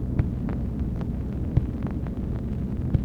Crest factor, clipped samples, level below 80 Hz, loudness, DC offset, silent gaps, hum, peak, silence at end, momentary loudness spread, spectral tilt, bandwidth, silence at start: 18 dB; under 0.1%; -32 dBFS; -29 LUFS; under 0.1%; none; none; -8 dBFS; 0 s; 4 LU; -10.5 dB/octave; 5 kHz; 0 s